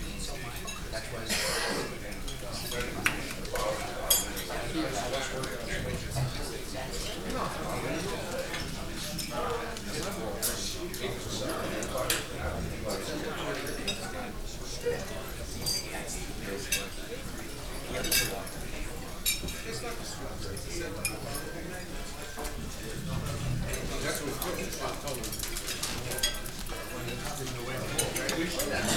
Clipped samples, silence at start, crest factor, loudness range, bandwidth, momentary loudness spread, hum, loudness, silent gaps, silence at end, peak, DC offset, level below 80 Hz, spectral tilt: under 0.1%; 0 s; 26 dB; 4 LU; over 20 kHz; 9 LU; none; -33 LUFS; none; 0 s; -8 dBFS; 0.6%; -42 dBFS; -3 dB/octave